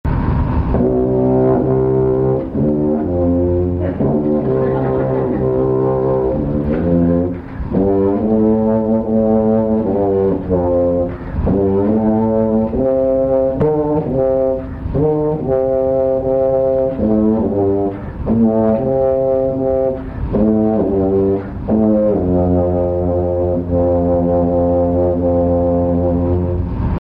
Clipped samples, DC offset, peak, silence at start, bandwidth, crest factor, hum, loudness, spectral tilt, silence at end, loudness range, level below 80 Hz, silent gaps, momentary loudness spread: under 0.1%; under 0.1%; -2 dBFS; 0.05 s; 4.5 kHz; 12 dB; none; -16 LUFS; -12.5 dB/octave; 0.15 s; 1 LU; -30 dBFS; none; 4 LU